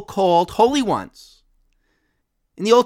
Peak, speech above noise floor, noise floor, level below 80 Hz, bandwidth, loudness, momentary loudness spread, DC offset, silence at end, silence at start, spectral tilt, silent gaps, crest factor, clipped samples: 0 dBFS; 53 dB; -70 dBFS; -54 dBFS; 14.5 kHz; -18 LUFS; 10 LU; under 0.1%; 0 s; 0 s; -5 dB/octave; none; 20 dB; under 0.1%